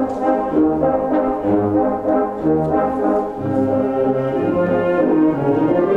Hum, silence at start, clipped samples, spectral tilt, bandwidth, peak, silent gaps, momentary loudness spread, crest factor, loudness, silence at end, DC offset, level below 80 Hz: none; 0 s; under 0.1%; -9.5 dB/octave; 4.5 kHz; -4 dBFS; none; 3 LU; 14 dB; -17 LUFS; 0 s; under 0.1%; -44 dBFS